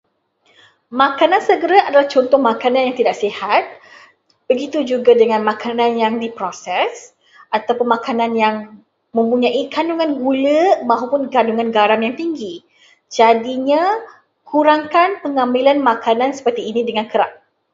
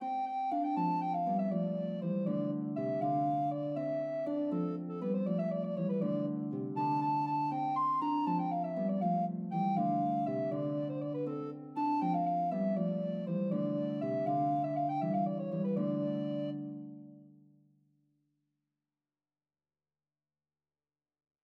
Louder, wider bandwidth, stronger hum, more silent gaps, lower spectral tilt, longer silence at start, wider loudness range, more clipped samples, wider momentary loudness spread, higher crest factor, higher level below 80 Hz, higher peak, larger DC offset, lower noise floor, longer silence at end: first, -16 LUFS vs -34 LUFS; first, 7.8 kHz vs 5.8 kHz; neither; neither; second, -4.5 dB/octave vs -10.5 dB/octave; first, 0.9 s vs 0 s; about the same, 4 LU vs 4 LU; neither; first, 9 LU vs 5 LU; about the same, 16 dB vs 14 dB; first, -66 dBFS vs under -90 dBFS; first, 0 dBFS vs -20 dBFS; neither; second, -60 dBFS vs under -90 dBFS; second, 0.4 s vs 4.15 s